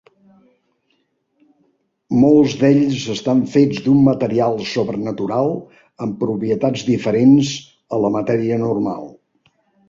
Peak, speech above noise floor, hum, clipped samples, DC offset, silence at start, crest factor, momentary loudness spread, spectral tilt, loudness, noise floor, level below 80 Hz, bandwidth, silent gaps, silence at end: -2 dBFS; 50 dB; none; under 0.1%; under 0.1%; 2.1 s; 16 dB; 12 LU; -7 dB/octave; -17 LUFS; -66 dBFS; -54 dBFS; 7.6 kHz; none; 0.8 s